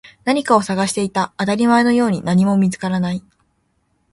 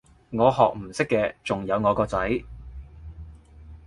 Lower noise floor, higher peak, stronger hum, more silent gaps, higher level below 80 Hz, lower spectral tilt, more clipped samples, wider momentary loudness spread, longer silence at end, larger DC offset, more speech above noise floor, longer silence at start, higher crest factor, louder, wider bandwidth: first, -65 dBFS vs -46 dBFS; about the same, -2 dBFS vs -4 dBFS; neither; neither; second, -54 dBFS vs -44 dBFS; about the same, -6 dB/octave vs -6.5 dB/octave; neither; second, 7 LU vs 22 LU; first, 0.9 s vs 0.1 s; neither; first, 48 dB vs 23 dB; second, 0.05 s vs 0.3 s; second, 16 dB vs 22 dB; first, -17 LUFS vs -24 LUFS; about the same, 11.5 kHz vs 11.5 kHz